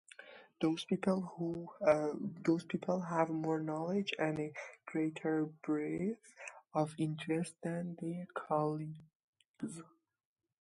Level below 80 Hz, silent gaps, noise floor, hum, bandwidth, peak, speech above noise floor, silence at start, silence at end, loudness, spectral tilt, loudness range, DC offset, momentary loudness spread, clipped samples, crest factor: -78 dBFS; 9.15-9.33 s, 9.45-9.54 s; -57 dBFS; none; 11.5 kHz; -16 dBFS; 20 dB; 0.2 s; 0.75 s; -37 LUFS; -6.5 dB/octave; 4 LU; under 0.1%; 13 LU; under 0.1%; 22 dB